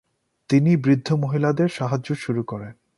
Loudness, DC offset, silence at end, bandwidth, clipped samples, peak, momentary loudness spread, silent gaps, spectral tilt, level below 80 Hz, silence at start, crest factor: -21 LUFS; under 0.1%; 0.25 s; 11.5 kHz; under 0.1%; -6 dBFS; 9 LU; none; -8 dB/octave; -60 dBFS; 0.5 s; 16 dB